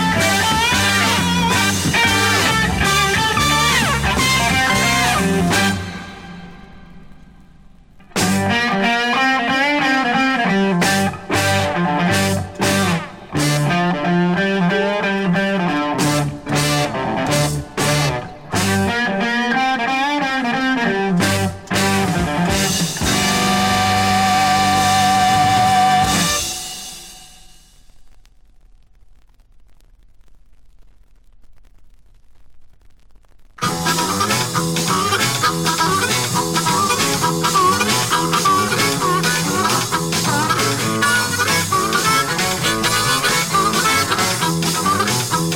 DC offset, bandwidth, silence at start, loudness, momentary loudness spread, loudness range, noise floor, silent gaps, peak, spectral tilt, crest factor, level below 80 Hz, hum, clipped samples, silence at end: under 0.1%; 17.5 kHz; 0 s; -16 LUFS; 5 LU; 6 LU; -46 dBFS; none; -2 dBFS; -3.5 dB/octave; 16 dB; -40 dBFS; none; under 0.1%; 0 s